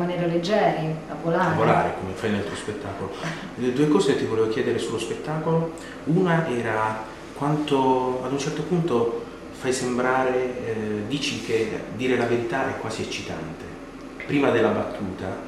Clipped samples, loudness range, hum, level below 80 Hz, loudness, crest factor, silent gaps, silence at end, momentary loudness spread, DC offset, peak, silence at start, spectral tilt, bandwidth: under 0.1%; 2 LU; none; -52 dBFS; -24 LUFS; 18 dB; none; 0 s; 11 LU; under 0.1%; -6 dBFS; 0 s; -6 dB/octave; 13 kHz